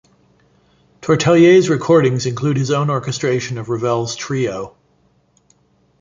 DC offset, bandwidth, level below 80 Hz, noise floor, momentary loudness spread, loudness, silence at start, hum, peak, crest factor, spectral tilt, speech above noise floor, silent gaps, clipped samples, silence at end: under 0.1%; 7.6 kHz; -54 dBFS; -58 dBFS; 12 LU; -16 LUFS; 1.05 s; none; -2 dBFS; 16 dB; -6 dB/octave; 43 dB; none; under 0.1%; 1.3 s